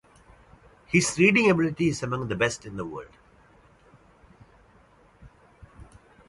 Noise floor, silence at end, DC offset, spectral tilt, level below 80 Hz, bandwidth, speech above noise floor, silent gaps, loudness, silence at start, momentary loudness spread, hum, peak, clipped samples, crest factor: -57 dBFS; 0.45 s; under 0.1%; -5 dB/octave; -56 dBFS; 11.5 kHz; 34 dB; none; -24 LUFS; 0.9 s; 17 LU; none; -6 dBFS; under 0.1%; 22 dB